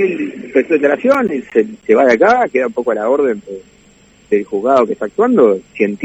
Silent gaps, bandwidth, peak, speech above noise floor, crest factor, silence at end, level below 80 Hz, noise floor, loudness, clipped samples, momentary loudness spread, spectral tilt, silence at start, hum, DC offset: none; 8 kHz; 0 dBFS; 34 dB; 14 dB; 0 s; -56 dBFS; -47 dBFS; -14 LUFS; under 0.1%; 8 LU; -6.5 dB/octave; 0 s; none; under 0.1%